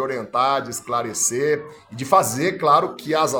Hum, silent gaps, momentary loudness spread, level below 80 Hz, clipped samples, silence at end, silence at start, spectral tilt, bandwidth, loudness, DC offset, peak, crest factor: none; none; 8 LU; -64 dBFS; under 0.1%; 0 s; 0 s; -3.5 dB/octave; 19 kHz; -20 LUFS; under 0.1%; -2 dBFS; 18 dB